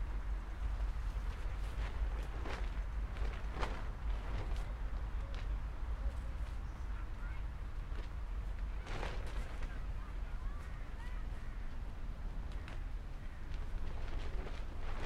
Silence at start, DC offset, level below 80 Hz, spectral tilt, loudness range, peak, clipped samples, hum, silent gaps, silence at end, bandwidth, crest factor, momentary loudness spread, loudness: 0 s; under 0.1%; -40 dBFS; -6 dB/octave; 4 LU; -24 dBFS; under 0.1%; none; none; 0 s; 10 kHz; 16 dB; 6 LU; -45 LUFS